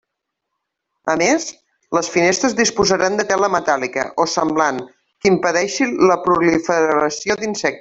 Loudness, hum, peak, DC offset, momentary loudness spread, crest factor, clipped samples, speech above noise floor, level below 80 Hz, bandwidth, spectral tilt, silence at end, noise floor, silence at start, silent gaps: -17 LUFS; none; -2 dBFS; under 0.1%; 6 LU; 16 dB; under 0.1%; 61 dB; -52 dBFS; 8 kHz; -3.5 dB/octave; 0 s; -78 dBFS; 1.05 s; none